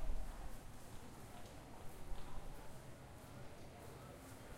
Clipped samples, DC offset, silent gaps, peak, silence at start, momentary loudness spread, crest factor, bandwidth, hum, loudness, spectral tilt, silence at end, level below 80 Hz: under 0.1%; under 0.1%; none; -30 dBFS; 0 s; 3 LU; 16 dB; 16 kHz; none; -56 LUFS; -5 dB/octave; 0 s; -52 dBFS